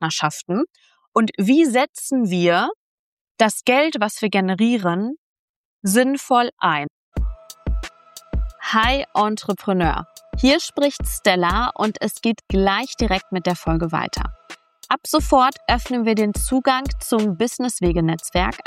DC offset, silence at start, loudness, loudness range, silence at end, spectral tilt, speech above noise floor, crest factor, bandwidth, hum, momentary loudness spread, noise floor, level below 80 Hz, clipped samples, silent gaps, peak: under 0.1%; 0 s; -20 LUFS; 3 LU; 0.05 s; -4.5 dB/octave; 20 dB; 18 dB; 16 kHz; none; 11 LU; -39 dBFS; -32 dBFS; under 0.1%; 1.08-1.12 s, 1.89-1.94 s, 2.75-3.35 s, 5.18-5.80 s, 6.52-6.57 s, 6.90-7.12 s; -2 dBFS